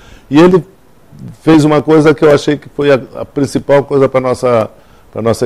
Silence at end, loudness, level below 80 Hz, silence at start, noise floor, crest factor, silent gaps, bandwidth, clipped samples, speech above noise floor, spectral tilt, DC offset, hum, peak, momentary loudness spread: 0 s; -10 LUFS; -42 dBFS; 0.3 s; -40 dBFS; 10 dB; none; 13.5 kHz; under 0.1%; 30 dB; -7 dB/octave; under 0.1%; none; 0 dBFS; 10 LU